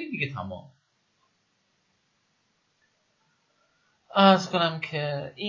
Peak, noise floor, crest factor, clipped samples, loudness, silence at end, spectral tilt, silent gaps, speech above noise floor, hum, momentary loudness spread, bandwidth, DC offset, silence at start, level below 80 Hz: -6 dBFS; -72 dBFS; 22 dB; under 0.1%; -24 LUFS; 0 s; -5.5 dB/octave; none; 47 dB; none; 18 LU; 7.4 kHz; under 0.1%; 0 s; -64 dBFS